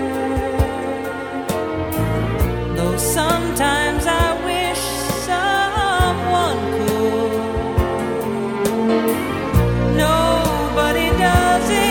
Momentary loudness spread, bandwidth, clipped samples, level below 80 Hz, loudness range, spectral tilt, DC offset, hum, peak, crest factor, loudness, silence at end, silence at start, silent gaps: 6 LU; 19 kHz; under 0.1%; -28 dBFS; 3 LU; -5 dB/octave; under 0.1%; none; 0 dBFS; 18 dB; -18 LUFS; 0 s; 0 s; none